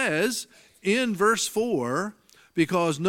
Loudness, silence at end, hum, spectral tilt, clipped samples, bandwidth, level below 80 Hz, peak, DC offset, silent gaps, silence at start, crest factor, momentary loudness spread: -25 LUFS; 0 s; none; -4 dB/octave; under 0.1%; 17 kHz; -68 dBFS; -10 dBFS; under 0.1%; none; 0 s; 16 dB; 11 LU